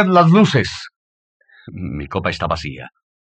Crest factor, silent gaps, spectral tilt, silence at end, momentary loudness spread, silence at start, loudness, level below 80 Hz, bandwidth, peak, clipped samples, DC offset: 16 dB; 0.96-1.40 s; -6.5 dB/octave; 0.35 s; 23 LU; 0 s; -17 LUFS; -44 dBFS; 8.6 kHz; -2 dBFS; under 0.1%; under 0.1%